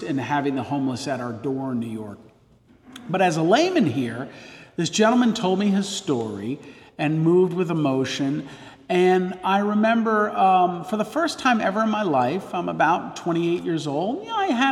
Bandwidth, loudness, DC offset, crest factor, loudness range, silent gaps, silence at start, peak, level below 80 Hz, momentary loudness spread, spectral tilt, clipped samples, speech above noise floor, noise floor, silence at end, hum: 13 kHz; -22 LUFS; under 0.1%; 18 dB; 3 LU; none; 0 s; -4 dBFS; -64 dBFS; 12 LU; -5.5 dB/octave; under 0.1%; 33 dB; -55 dBFS; 0 s; none